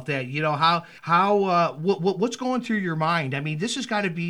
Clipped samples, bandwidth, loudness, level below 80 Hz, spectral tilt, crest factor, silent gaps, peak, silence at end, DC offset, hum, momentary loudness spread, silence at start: under 0.1%; 12 kHz; -23 LUFS; -72 dBFS; -5.5 dB/octave; 16 dB; none; -8 dBFS; 0 s; under 0.1%; none; 7 LU; 0 s